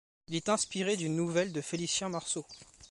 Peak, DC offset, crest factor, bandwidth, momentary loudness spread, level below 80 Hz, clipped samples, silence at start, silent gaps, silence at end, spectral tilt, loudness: -16 dBFS; under 0.1%; 18 dB; 11.5 kHz; 7 LU; -68 dBFS; under 0.1%; 0.3 s; none; 0.05 s; -3.5 dB/octave; -33 LUFS